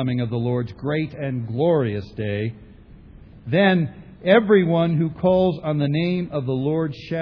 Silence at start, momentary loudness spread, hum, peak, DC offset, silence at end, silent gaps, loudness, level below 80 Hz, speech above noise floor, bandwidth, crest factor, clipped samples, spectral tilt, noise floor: 0 s; 10 LU; none; -2 dBFS; under 0.1%; 0 s; none; -21 LUFS; -50 dBFS; 24 dB; 5.4 kHz; 18 dB; under 0.1%; -9.5 dB/octave; -44 dBFS